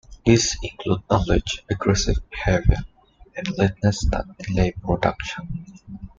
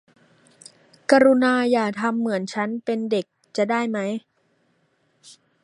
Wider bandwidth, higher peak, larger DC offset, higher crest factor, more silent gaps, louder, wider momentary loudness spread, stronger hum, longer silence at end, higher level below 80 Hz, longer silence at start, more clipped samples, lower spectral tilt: second, 9.2 kHz vs 11 kHz; about the same, -2 dBFS vs -2 dBFS; neither; about the same, 20 dB vs 22 dB; neither; about the same, -23 LUFS vs -22 LUFS; about the same, 13 LU vs 12 LU; neither; second, 0.1 s vs 0.35 s; first, -30 dBFS vs -72 dBFS; second, 0.1 s vs 1.1 s; neither; about the same, -5 dB/octave vs -5 dB/octave